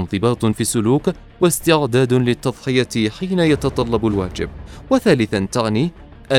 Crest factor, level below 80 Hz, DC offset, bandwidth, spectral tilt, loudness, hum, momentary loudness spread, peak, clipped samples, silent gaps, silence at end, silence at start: 18 dB; -40 dBFS; under 0.1%; 18 kHz; -5.5 dB/octave; -18 LUFS; none; 7 LU; 0 dBFS; under 0.1%; none; 0 s; 0 s